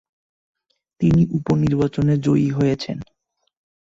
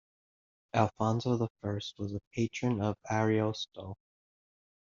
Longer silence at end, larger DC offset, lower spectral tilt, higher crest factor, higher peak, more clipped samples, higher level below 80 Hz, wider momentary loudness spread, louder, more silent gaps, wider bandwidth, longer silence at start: about the same, 0.9 s vs 0.95 s; neither; first, -8.5 dB/octave vs -6 dB/octave; second, 14 dB vs 22 dB; first, -6 dBFS vs -10 dBFS; neither; first, -44 dBFS vs -66 dBFS; second, 8 LU vs 11 LU; first, -19 LUFS vs -33 LUFS; second, none vs 1.50-1.55 s, 2.27-2.31 s; about the same, 7.6 kHz vs 7.4 kHz; first, 1 s vs 0.75 s